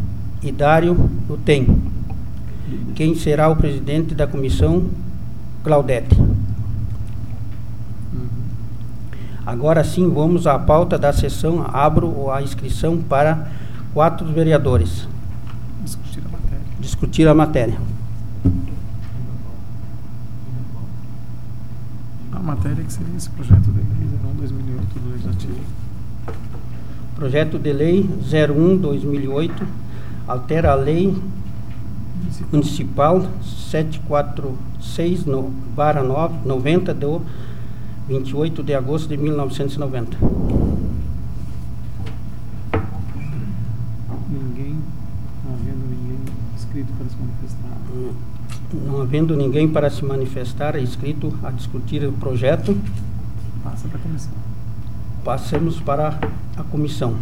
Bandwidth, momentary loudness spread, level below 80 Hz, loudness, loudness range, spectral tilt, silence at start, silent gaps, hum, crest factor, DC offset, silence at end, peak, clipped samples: 16.5 kHz; 16 LU; -30 dBFS; -21 LUFS; 9 LU; -8 dB/octave; 0 s; none; none; 20 dB; 7%; 0 s; 0 dBFS; under 0.1%